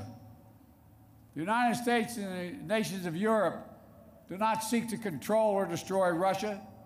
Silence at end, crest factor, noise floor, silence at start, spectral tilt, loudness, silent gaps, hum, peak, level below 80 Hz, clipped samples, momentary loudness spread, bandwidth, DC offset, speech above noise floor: 0 s; 14 dB; -58 dBFS; 0 s; -5 dB/octave; -31 LUFS; none; none; -18 dBFS; -68 dBFS; under 0.1%; 11 LU; 16 kHz; under 0.1%; 27 dB